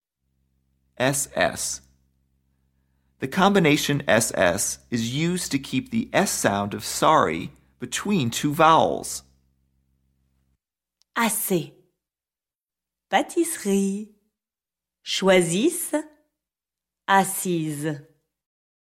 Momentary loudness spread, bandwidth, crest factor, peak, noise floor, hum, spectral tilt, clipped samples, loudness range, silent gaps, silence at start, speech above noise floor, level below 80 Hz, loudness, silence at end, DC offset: 13 LU; 16.5 kHz; 22 dB; -4 dBFS; under -90 dBFS; none; -4 dB/octave; under 0.1%; 7 LU; none; 1 s; over 68 dB; -58 dBFS; -22 LUFS; 0.9 s; under 0.1%